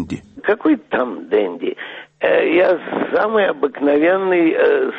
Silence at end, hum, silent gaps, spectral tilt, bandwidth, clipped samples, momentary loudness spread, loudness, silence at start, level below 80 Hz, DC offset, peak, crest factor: 0 s; none; none; -7 dB/octave; 8 kHz; under 0.1%; 10 LU; -17 LUFS; 0 s; -58 dBFS; under 0.1%; -4 dBFS; 12 dB